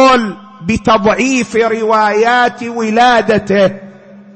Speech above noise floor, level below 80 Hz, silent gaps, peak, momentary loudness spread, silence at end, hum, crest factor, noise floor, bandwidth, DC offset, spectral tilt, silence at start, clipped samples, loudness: 24 dB; -42 dBFS; none; 0 dBFS; 9 LU; 0.15 s; none; 10 dB; -36 dBFS; 8.8 kHz; under 0.1%; -4.5 dB/octave; 0 s; under 0.1%; -11 LUFS